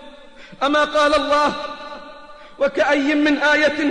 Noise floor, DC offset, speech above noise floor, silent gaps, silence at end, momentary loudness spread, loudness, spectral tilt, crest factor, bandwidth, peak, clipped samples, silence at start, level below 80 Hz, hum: -41 dBFS; 0.3%; 24 dB; none; 0 s; 15 LU; -17 LUFS; -3 dB/octave; 12 dB; 10 kHz; -6 dBFS; under 0.1%; 0 s; -48 dBFS; none